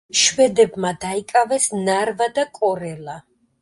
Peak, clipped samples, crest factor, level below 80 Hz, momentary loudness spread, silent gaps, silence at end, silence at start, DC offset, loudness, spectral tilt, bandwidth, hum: -2 dBFS; under 0.1%; 18 dB; -58 dBFS; 15 LU; none; 0.4 s; 0.15 s; under 0.1%; -19 LUFS; -2.5 dB/octave; 11.5 kHz; none